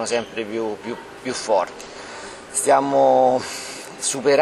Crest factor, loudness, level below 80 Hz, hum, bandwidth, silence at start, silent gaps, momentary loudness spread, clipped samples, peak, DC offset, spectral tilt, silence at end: 16 dB; -21 LUFS; -60 dBFS; none; 14.5 kHz; 0 s; none; 19 LU; under 0.1%; -4 dBFS; under 0.1%; -3 dB/octave; 0 s